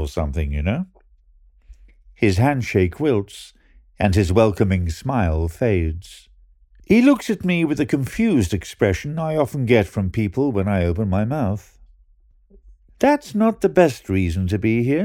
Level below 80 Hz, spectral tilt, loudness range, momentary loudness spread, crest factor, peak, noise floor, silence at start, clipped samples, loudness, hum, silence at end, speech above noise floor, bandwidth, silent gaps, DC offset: -34 dBFS; -7 dB/octave; 3 LU; 7 LU; 18 dB; -2 dBFS; -55 dBFS; 0 s; under 0.1%; -20 LUFS; none; 0 s; 36 dB; 16.5 kHz; none; under 0.1%